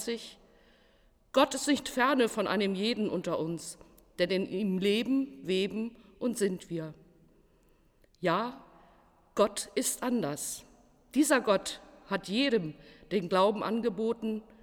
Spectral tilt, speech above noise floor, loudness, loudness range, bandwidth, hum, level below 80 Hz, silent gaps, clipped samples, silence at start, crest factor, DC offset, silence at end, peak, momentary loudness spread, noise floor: -4 dB/octave; 35 dB; -31 LUFS; 6 LU; 19.5 kHz; none; -64 dBFS; none; under 0.1%; 0 s; 20 dB; under 0.1%; 0.2 s; -12 dBFS; 13 LU; -65 dBFS